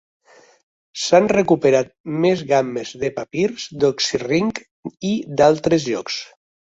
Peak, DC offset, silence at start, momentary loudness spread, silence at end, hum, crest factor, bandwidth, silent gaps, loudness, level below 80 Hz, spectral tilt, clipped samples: -2 dBFS; under 0.1%; 0.95 s; 12 LU; 0.45 s; none; 18 dB; 8 kHz; 2.00-2.04 s, 4.71-4.83 s; -19 LUFS; -56 dBFS; -5 dB/octave; under 0.1%